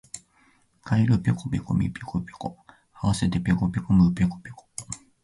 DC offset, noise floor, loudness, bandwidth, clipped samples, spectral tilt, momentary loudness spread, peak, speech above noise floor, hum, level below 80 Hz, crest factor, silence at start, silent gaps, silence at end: under 0.1%; -62 dBFS; -25 LUFS; 11.5 kHz; under 0.1%; -6.5 dB/octave; 18 LU; -8 dBFS; 38 dB; none; -44 dBFS; 16 dB; 0.15 s; none; 0.25 s